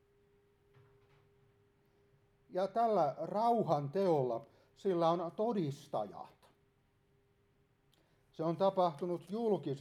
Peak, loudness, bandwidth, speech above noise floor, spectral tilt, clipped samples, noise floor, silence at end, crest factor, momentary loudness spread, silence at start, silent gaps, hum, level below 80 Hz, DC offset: -18 dBFS; -35 LUFS; 13.5 kHz; 39 dB; -8 dB/octave; under 0.1%; -73 dBFS; 0 s; 20 dB; 9 LU; 2.5 s; none; none; -80 dBFS; under 0.1%